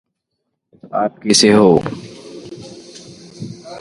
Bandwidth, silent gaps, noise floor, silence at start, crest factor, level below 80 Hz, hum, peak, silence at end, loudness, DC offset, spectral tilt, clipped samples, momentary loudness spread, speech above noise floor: 11.5 kHz; none; -74 dBFS; 0.85 s; 18 dB; -52 dBFS; none; 0 dBFS; 0 s; -13 LUFS; under 0.1%; -4 dB/octave; under 0.1%; 25 LU; 61 dB